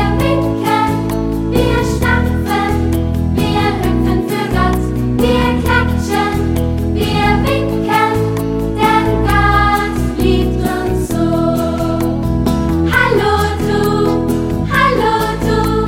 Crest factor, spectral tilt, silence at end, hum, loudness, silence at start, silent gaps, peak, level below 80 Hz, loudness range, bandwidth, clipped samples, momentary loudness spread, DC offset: 14 dB; -6.5 dB/octave; 0 s; none; -14 LUFS; 0 s; none; 0 dBFS; -22 dBFS; 1 LU; 17 kHz; under 0.1%; 4 LU; under 0.1%